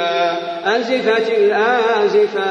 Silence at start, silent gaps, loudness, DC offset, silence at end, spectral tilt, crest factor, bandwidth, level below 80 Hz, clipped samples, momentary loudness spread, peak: 0 s; none; -16 LUFS; under 0.1%; 0 s; -4 dB/octave; 14 dB; 7.4 kHz; -66 dBFS; under 0.1%; 4 LU; -2 dBFS